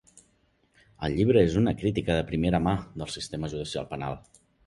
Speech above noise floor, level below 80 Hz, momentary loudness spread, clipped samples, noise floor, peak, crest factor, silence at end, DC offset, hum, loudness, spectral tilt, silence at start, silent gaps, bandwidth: 41 dB; -44 dBFS; 13 LU; under 0.1%; -67 dBFS; -8 dBFS; 20 dB; 0.45 s; under 0.1%; none; -27 LUFS; -6.5 dB/octave; 1 s; none; 11.5 kHz